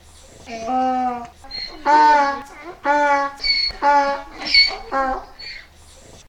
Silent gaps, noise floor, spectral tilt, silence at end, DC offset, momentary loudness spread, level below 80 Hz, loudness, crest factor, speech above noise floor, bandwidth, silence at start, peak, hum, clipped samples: none; -45 dBFS; -2 dB/octave; 0.65 s; under 0.1%; 20 LU; -44 dBFS; -17 LUFS; 18 dB; 29 dB; 11 kHz; 0.45 s; -2 dBFS; none; under 0.1%